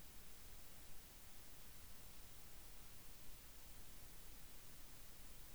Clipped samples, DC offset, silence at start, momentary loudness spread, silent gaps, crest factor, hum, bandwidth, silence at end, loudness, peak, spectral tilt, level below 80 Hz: under 0.1%; 0.1%; 0 s; 0 LU; none; 14 dB; none; over 20 kHz; 0 s; -58 LUFS; -42 dBFS; -2.5 dB/octave; -64 dBFS